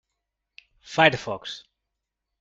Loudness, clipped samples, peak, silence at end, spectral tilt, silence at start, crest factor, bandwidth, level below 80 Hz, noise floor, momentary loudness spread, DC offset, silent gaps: -23 LUFS; under 0.1%; -2 dBFS; 0.8 s; -4.5 dB/octave; 0.85 s; 26 dB; 7.8 kHz; -62 dBFS; -83 dBFS; 18 LU; under 0.1%; none